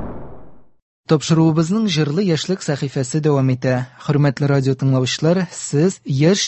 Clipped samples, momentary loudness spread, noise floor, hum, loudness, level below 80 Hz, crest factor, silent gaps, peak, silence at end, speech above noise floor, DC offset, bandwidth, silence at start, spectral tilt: under 0.1%; 6 LU; -41 dBFS; none; -18 LUFS; -50 dBFS; 18 dB; 0.82-1.03 s; 0 dBFS; 0 s; 24 dB; under 0.1%; 8.6 kHz; 0 s; -6 dB/octave